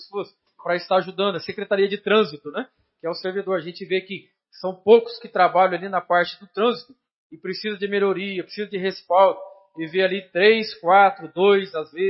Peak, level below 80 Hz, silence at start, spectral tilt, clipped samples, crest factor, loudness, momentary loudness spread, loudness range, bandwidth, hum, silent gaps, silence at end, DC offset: -2 dBFS; -76 dBFS; 0 s; -8.5 dB/octave; under 0.1%; 20 dB; -21 LUFS; 16 LU; 5 LU; 5.8 kHz; none; 7.16-7.30 s; 0 s; under 0.1%